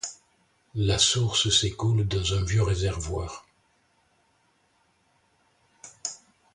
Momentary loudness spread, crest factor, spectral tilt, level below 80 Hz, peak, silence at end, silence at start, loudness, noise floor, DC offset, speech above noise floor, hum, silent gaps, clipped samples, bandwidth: 17 LU; 20 dB; -3.5 dB/octave; -42 dBFS; -8 dBFS; 0.4 s; 0.05 s; -25 LUFS; -67 dBFS; under 0.1%; 43 dB; none; none; under 0.1%; 11 kHz